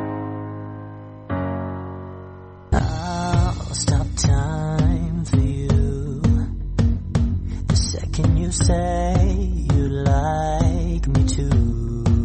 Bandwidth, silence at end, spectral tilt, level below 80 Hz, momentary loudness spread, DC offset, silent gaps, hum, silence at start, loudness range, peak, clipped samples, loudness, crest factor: 8.8 kHz; 0 s; -6 dB/octave; -24 dBFS; 12 LU; under 0.1%; none; none; 0 s; 5 LU; -6 dBFS; under 0.1%; -21 LUFS; 14 dB